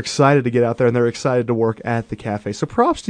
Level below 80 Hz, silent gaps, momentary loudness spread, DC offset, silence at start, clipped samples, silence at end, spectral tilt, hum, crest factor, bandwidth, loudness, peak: -50 dBFS; none; 10 LU; under 0.1%; 0 s; under 0.1%; 0 s; -6 dB/octave; none; 16 dB; 10 kHz; -18 LUFS; -2 dBFS